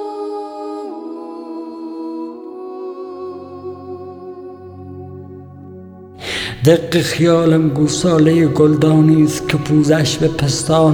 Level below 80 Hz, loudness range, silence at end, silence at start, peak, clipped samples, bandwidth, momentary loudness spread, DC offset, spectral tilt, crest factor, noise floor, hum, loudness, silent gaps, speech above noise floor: -46 dBFS; 18 LU; 0 s; 0 s; 0 dBFS; under 0.1%; 18.5 kHz; 21 LU; under 0.1%; -6 dB/octave; 16 dB; -36 dBFS; none; -14 LUFS; none; 23 dB